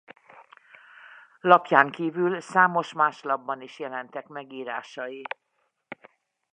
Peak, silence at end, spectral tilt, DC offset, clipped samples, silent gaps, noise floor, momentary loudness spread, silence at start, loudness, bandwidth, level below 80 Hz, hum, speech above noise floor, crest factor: -2 dBFS; 1.3 s; -5.5 dB/octave; under 0.1%; under 0.1%; none; -74 dBFS; 20 LU; 1.45 s; -24 LUFS; 9.8 kHz; -84 dBFS; none; 50 dB; 26 dB